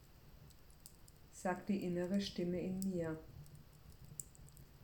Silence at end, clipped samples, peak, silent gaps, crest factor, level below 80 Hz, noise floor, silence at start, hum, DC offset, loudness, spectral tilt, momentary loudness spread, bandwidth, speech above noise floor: 0 s; under 0.1%; -22 dBFS; none; 22 dB; -64 dBFS; -61 dBFS; 0 s; none; under 0.1%; -42 LUFS; -6 dB/octave; 23 LU; 19 kHz; 21 dB